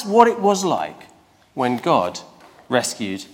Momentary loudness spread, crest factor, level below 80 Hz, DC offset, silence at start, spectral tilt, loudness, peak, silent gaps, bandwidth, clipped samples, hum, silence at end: 15 LU; 20 dB; -64 dBFS; under 0.1%; 0 s; -4 dB/octave; -20 LUFS; 0 dBFS; none; 17 kHz; under 0.1%; none; 0.1 s